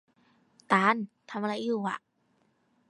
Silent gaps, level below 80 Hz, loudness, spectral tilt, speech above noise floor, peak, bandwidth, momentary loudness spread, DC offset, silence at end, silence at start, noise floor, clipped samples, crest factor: none; -84 dBFS; -29 LUFS; -5.5 dB/octave; 42 dB; -6 dBFS; 11 kHz; 13 LU; under 0.1%; 0.9 s; 0.7 s; -71 dBFS; under 0.1%; 24 dB